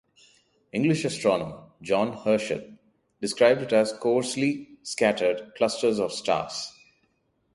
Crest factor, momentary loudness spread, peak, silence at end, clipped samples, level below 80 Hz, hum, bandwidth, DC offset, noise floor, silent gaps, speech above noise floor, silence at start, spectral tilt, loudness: 20 dB; 12 LU; -6 dBFS; 0.85 s; under 0.1%; -64 dBFS; none; 11.5 kHz; under 0.1%; -71 dBFS; none; 46 dB; 0.75 s; -4.5 dB/octave; -25 LUFS